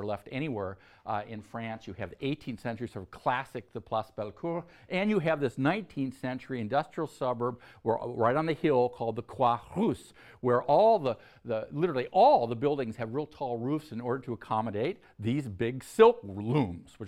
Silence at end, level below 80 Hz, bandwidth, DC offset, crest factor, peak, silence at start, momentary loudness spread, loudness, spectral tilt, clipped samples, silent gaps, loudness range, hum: 0 s; -64 dBFS; 13 kHz; under 0.1%; 22 dB; -8 dBFS; 0 s; 15 LU; -30 LUFS; -7.5 dB/octave; under 0.1%; none; 9 LU; none